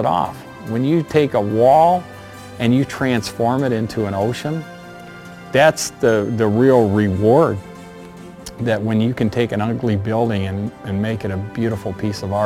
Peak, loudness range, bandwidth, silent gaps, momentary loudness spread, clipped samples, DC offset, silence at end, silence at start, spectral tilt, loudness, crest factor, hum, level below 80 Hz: 0 dBFS; 4 LU; 16 kHz; none; 22 LU; under 0.1%; under 0.1%; 0 s; 0 s; -6.5 dB/octave; -18 LUFS; 18 dB; none; -50 dBFS